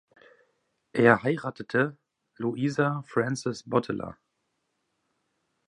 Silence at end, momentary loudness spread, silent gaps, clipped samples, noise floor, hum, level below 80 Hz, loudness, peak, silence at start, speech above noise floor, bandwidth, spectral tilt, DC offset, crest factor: 1.55 s; 13 LU; none; under 0.1%; -78 dBFS; none; -66 dBFS; -27 LUFS; -4 dBFS; 0.95 s; 52 dB; 11 kHz; -6.5 dB/octave; under 0.1%; 26 dB